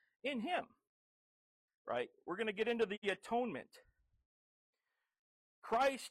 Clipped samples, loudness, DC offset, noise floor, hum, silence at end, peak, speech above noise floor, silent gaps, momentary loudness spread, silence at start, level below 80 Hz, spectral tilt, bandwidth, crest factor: under 0.1%; -39 LUFS; under 0.1%; under -90 dBFS; none; 0 s; -24 dBFS; over 51 dB; 0.87-1.68 s, 1.75-1.85 s, 2.98-3.02 s, 4.25-4.73 s, 5.19-5.62 s; 13 LU; 0.25 s; -78 dBFS; -4 dB/octave; 14.5 kHz; 18 dB